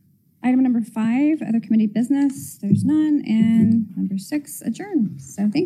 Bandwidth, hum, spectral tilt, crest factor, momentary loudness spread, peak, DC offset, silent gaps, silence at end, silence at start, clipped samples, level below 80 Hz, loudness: 14.5 kHz; none; -7 dB/octave; 16 dB; 9 LU; -4 dBFS; under 0.1%; none; 0 s; 0.45 s; under 0.1%; -68 dBFS; -20 LUFS